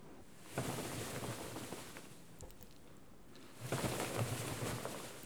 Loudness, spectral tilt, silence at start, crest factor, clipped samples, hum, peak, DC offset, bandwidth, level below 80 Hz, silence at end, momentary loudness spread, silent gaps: -43 LUFS; -4 dB/octave; 0 s; 22 dB; under 0.1%; none; -22 dBFS; 0.1%; over 20 kHz; -64 dBFS; 0 s; 19 LU; none